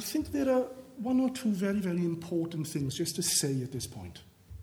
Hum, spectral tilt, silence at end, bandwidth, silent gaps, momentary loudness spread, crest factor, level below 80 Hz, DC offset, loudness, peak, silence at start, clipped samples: none; -4.5 dB/octave; 0 s; over 20 kHz; none; 11 LU; 16 dB; -58 dBFS; under 0.1%; -31 LUFS; -16 dBFS; 0 s; under 0.1%